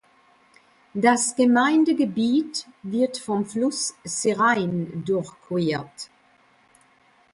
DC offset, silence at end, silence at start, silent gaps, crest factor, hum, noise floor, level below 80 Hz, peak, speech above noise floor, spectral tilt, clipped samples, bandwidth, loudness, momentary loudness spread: under 0.1%; 1.3 s; 0.95 s; none; 18 dB; none; -59 dBFS; -66 dBFS; -6 dBFS; 37 dB; -4.5 dB/octave; under 0.1%; 11.5 kHz; -23 LUFS; 12 LU